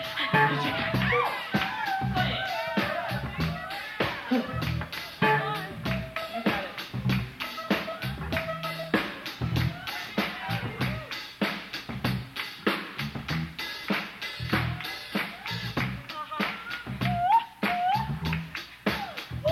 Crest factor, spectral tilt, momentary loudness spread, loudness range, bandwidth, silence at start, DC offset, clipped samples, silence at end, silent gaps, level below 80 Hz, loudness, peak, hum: 20 dB; -5.5 dB/octave; 10 LU; 3 LU; 16 kHz; 0 s; under 0.1%; under 0.1%; 0 s; none; -50 dBFS; -29 LUFS; -10 dBFS; none